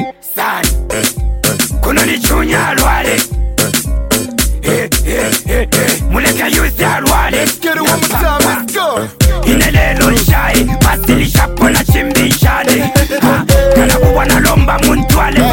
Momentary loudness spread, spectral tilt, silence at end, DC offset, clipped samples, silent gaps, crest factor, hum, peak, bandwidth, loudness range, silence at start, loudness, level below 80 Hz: 5 LU; -4 dB/octave; 0 s; under 0.1%; under 0.1%; none; 10 dB; none; 0 dBFS; 17.5 kHz; 3 LU; 0 s; -11 LUFS; -16 dBFS